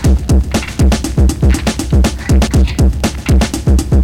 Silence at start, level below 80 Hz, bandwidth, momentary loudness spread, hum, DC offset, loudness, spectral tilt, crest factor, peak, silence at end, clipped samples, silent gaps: 0 s; -12 dBFS; 15 kHz; 2 LU; none; 0.8%; -13 LUFS; -6 dB/octave; 8 dB; -4 dBFS; 0 s; under 0.1%; none